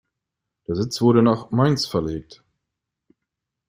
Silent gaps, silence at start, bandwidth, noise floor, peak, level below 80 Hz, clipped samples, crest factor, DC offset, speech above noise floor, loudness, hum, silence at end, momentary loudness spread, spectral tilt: none; 0.7 s; 16 kHz; -83 dBFS; -4 dBFS; -52 dBFS; under 0.1%; 20 dB; under 0.1%; 63 dB; -20 LUFS; none; 1.45 s; 14 LU; -6.5 dB/octave